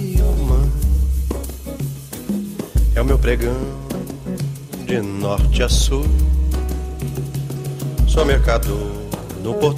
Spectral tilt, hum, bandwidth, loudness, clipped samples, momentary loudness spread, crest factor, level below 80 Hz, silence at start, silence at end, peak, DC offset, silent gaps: -6 dB/octave; none; 15.5 kHz; -20 LUFS; under 0.1%; 11 LU; 16 dB; -20 dBFS; 0 s; 0 s; -2 dBFS; under 0.1%; none